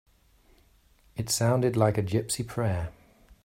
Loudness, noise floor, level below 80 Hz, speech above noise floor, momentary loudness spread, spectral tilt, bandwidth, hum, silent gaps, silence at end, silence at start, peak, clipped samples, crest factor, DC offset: -27 LUFS; -61 dBFS; -54 dBFS; 35 dB; 13 LU; -5 dB/octave; 16 kHz; none; none; 0.55 s; 1.15 s; -8 dBFS; under 0.1%; 22 dB; under 0.1%